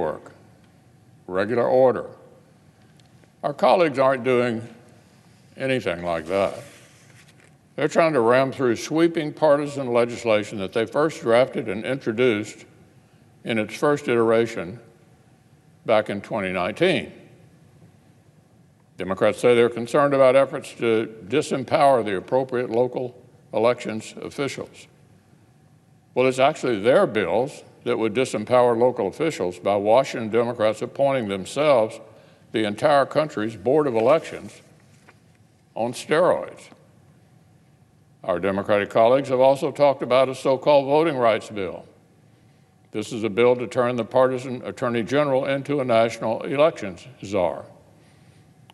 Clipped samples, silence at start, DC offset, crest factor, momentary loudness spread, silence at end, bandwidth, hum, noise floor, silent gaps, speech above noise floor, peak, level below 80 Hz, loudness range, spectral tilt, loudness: under 0.1%; 0 s; under 0.1%; 20 dB; 13 LU; 1.05 s; 12.5 kHz; none; -56 dBFS; none; 35 dB; -4 dBFS; -66 dBFS; 6 LU; -5.5 dB/octave; -22 LUFS